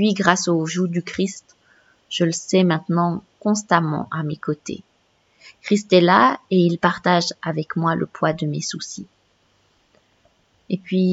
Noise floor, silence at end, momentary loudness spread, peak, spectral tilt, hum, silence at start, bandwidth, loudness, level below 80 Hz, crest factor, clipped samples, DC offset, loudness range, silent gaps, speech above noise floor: -62 dBFS; 0 s; 13 LU; 0 dBFS; -5 dB/octave; none; 0 s; 8 kHz; -20 LUFS; -62 dBFS; 20 dB; under 0.1%; under 0.1%; 8 LU; none; 43 dB